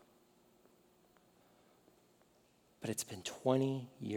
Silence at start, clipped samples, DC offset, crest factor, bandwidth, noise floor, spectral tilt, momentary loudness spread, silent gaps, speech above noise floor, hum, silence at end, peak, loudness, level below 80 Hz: 2.8 s; under 0.1%; under 0.1%; 26 dB; 18 kHz; -71 dBFS; -5 dB/octave; 10 LU; none; 33 dB; 60 Hz at -75 dBFS; 0 s; -16 dBFS; -38 LUFS; -84 dBFS